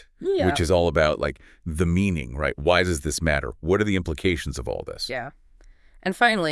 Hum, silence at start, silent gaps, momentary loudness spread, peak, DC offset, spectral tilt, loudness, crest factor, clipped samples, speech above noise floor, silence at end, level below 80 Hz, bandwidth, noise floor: none; 0.2 s; none; 11 LU; -4 dBFS; under 0.1%; -5 dB/octave; -24 LUFS; 20 dB; under 0.1%; 28 dB; 0 s; -40 dBFS; 12 kHz; -51 dBFS